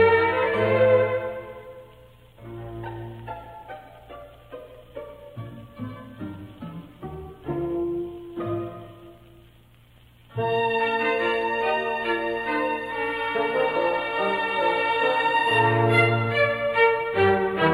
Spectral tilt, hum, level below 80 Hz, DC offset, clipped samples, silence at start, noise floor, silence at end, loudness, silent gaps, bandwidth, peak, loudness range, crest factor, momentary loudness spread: -6.5 dB/octave; none; -54 dBFS; under 0.1%; under 0.1%; 0 s; -53 dBFS; 0 s; -23 LUFS; none; 15 kHz; -6 dBFS; 19 LU; 18 dB; 22 LU